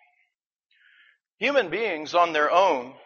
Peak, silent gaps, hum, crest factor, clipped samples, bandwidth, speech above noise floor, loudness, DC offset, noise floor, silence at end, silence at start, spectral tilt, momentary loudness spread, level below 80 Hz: -6 dBFS; none; none; 20 dB; under 0.1%; 7 kHz; 52 dB; -23 LUFS; under 0.1%; -75 dBFS; 0.15 s; 1.4 s; -0.5 dB/octave; 7 LU; -74 dBFS